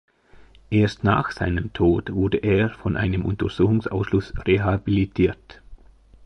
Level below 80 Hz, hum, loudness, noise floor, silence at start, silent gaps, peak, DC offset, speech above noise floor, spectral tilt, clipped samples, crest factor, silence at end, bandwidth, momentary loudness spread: -38 dBFS; none; -22 LUFS; -50 dBFS; 0.7 s; none; -6 dBFS; under 0.1%; 29 dB; -8.5 dB/octave; under 0.1%; 16 dB; 0 s; 8.2 kHz; 4 LU